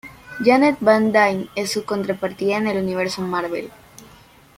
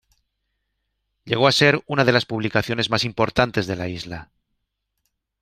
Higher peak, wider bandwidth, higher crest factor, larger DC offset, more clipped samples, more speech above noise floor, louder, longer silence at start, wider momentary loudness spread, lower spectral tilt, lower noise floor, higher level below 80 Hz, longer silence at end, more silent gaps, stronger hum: about the same, -2 dBFS vs -2 dBFS; about the same, 16.5 kHz vs 15 kHz; about the same, 18 dB vs 22 dB; neither; neither; second, 29 dB vs 56 dB; about the same, -19 LUFS vs -20 LUFS; second, 0.05 s vs 1.25 s; about the same, 11 LU vs 13 LU; about the same, -5 dB/octave vs -5 dB/octave; second, -48 dBFS vs -77 dBFS; about the same, -56 dBFS vs -52 dBFS; second, 0.55 s vs 1.15 s; neither; neither